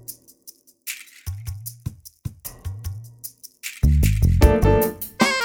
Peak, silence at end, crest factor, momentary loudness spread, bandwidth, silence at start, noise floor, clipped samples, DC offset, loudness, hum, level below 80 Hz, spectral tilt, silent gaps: 0 dBFS; 0 s; 22 dB; 20 LU; over 20 kHz; 0.1 s; -49 dBFS; under 0.1%; under 0.1%; -21 LUFS; none; -26 dBFS; -5.5 dB/octave; none